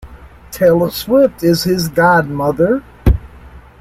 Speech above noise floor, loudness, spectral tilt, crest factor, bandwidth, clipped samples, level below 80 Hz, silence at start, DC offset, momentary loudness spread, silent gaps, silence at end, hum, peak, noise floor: 25 dB; -14 LUFS; -6 dB/octave; 14 dB; 16.5 kHz; under 0.1%; -26 dBFS; 0.05 s; under 0.1%; 5 LU; none; 0.25 s; none; -2 dBFS; -38 dBFS